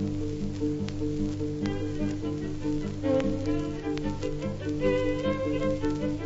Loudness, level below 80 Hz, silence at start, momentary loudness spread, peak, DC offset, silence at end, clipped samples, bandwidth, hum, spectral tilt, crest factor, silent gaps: -30 LUFS; -40 dBFS; 0 s; 5 LU; -12 dBFS; under 0.1%; 0 s; under 0.1%; 8 kHz; 50 Hz at -45 dBFS; -7.5 dB/octave; 16 dB; none